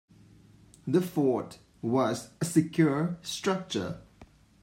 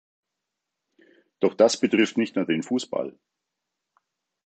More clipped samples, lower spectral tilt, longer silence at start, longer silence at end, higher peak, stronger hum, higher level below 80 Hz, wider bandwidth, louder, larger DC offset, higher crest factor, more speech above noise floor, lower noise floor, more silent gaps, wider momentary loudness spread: neither; first, -6 dB/octave vs -4.5 dB/octave; second, 0.85 s vs 1.4 s; second, 0.4 s vs 1.35 s; second, -10 dBFS vs -6 dBFS; neither; first, -64 dBFS vs -76 dBFS; first, 16 kHz vs 9 kHz; second, -29 LUFS vs -23 LUFS; neither; about the same, 20 dB vs 22 dB; second, 28 dB vs 61 dB; second, -56 dBFS vs -84 dBFS; neither; about the same, 12 LU vs 11 LU